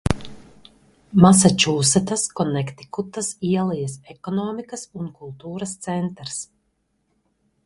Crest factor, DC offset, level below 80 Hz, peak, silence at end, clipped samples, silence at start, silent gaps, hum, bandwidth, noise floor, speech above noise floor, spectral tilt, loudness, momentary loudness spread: 22 dB; under 0.1%; -44 dBFS; 0 dBFS; 1.2 s; under 0.1%; 0.05 s; none; none; 11.5 kHz; -70 dBFS; 49 dB; -4.5 dB/octave; -21 LUFS; 19 LU